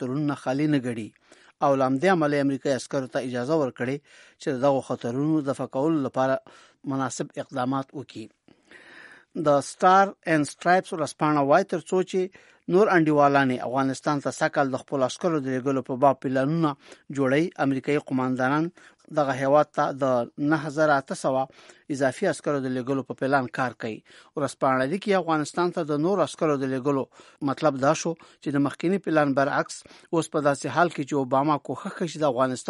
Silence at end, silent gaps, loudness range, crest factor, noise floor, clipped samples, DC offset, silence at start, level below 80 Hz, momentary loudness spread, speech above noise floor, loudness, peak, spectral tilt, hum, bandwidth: 0 s; none; 4 LU; 18 dB; -49 dBFS; under 0.1%; under 0.1%; 0 s; -70 dBFS; 11 LU; 25 dB; -25 LUFS; -6 dBFS; -6 dB/octave; none; 11.5 kHz